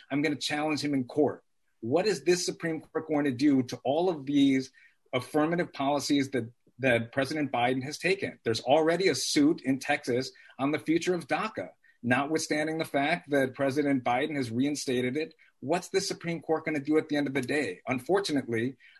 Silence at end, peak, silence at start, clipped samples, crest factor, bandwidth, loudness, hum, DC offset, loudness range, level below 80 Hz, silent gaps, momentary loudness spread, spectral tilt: 0.25 s; -12 dBFS; 0.1 s; under 0.1%; 18 dB; 12.5 kHz; -29 LUFS; none; under 0.1%; 3 LU; -68 dBFS; none; 8 LU; -4.5 dB/octave